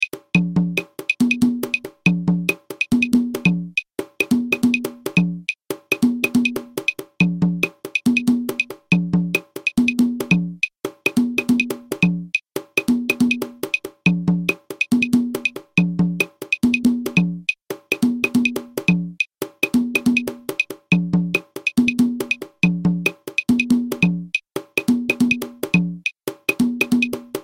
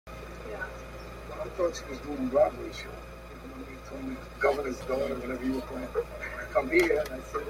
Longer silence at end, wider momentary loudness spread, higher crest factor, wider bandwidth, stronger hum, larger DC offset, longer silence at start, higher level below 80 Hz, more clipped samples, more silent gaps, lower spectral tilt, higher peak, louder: about the same, 0 s vs 0 s; second, 6 LU vs 17 LU; about the same, 18 dB vs 20 dB; about the same, 16.5 kHz vs 16.5 kHz; neither; neither; about the same, 0 s vs 0.05 s; second, -52 dBFS vs -46 dBFS; neither; neither; about the same, -5.5 dB/octave vs -5.5 dB/octave; first, -2 dBFS vs -12 dBFS; first, -20 LUFS vs -31 LUFS